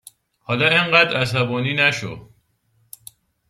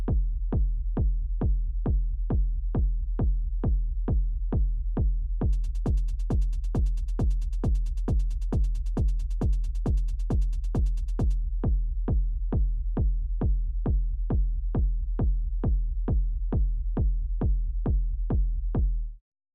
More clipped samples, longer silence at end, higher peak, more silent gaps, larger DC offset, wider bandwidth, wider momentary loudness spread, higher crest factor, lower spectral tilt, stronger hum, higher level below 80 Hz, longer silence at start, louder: neither; first, 1.25 s vs 0.4 s; first, -2 dBFS vs -18 dBFS; neither; neither; first, 15.5 kHz vs 1.8 kHz; first, 15 LU vs 1 LU; first, 20 dB vs 8 dB; second, -4.5 dB/octave vs -9.5 dB/octave; neither; second, -58 dBFS vs -26 dBFS; first, 0.5 s vs 0 s; first, -17 LUFS vs -30 LUFS